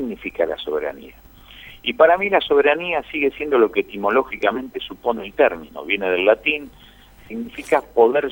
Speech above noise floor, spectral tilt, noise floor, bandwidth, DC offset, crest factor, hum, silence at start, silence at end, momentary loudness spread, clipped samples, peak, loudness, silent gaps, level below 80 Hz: 23 dB; -5 dB/octave; -42 dBFS; over 20 kHz; under 0.1%; 18 dB; none; 0 s; 0 s; 14 LU; under 0.1%; -2 dBFS; -19 LUFS; none; -50 dBFS